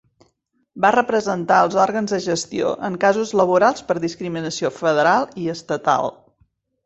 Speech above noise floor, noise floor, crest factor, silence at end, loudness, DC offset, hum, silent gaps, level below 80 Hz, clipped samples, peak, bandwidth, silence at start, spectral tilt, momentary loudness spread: 48 dB; -66 dBFS; 18 dB; 0.75 s; -19 LUFS; under 0.1%; none; none; -60 dBFS; under 0.1%; -2 dBFS; 8.2 kHz; 0.75 s; -4.5 dB/octave; 9 LU